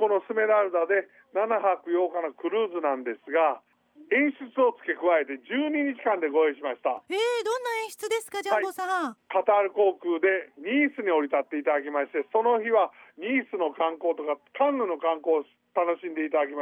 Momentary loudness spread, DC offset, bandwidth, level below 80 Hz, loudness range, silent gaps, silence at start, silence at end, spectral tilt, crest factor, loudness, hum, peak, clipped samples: 7 LU; under 0.1%; 17.5 kHz; -84 dBFS; 2 LU; none; 0 s; 0 s; -3.5 dB/octave; 16 dB; -26 LUFS; none; -10 dBFS; under 0.1%